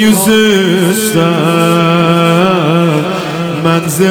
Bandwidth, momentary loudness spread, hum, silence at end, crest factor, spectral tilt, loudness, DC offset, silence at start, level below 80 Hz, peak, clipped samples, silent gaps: 20 kHz; 6 LU; none; 0 s; 10 dB; -5 dB/octave; -10 LUFS; under 0.1%; 0 s; -46 dBFS; 0 dBFS; under 0.1%; none